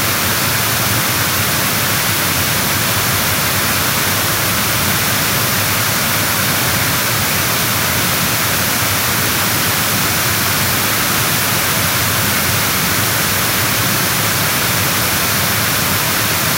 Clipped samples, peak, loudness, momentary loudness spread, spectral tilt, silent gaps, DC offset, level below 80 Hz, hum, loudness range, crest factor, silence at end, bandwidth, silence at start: under 0.1%; 0 dBFS; -13 LUFS; 0 LU; -2 dB/octave; none; under 0.1%; -40 dBFS; none; 0 LU; 14 dB; 0 s; 16.5 kHz; 0 s